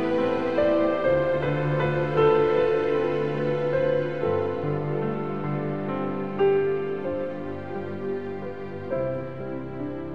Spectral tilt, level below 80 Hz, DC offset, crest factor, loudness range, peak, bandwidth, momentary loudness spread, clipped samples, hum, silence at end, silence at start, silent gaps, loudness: -9 dB/octave; -54 dBFS; 0.9%; 16 dB; 5 LU; -8 dBFS; 6.6 kHz; 11 LU; under 0.1%; none; 0 s; 0 s; none; -26 LUFS